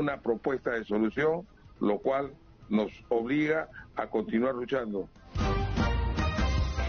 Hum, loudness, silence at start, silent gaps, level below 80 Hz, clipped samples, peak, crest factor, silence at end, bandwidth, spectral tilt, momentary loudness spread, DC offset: none; -30 LUFS; 0 s; none; -38 dBFS; under 0.1%; -14 dBFS; 14 dB; 0 s; 6.8 kHz; -6 dB/octave; 8 LU; under 0.1%